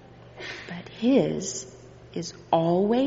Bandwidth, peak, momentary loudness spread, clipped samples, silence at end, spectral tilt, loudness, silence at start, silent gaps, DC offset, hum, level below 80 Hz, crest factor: 8 kHz; -8 dBFS; 16 LU; under 0.1%; 0 s; -5.5 dB/octave; -26 LUFS; 0.1 s; none; under 0.1%; none; -62 dBFS; 18 dB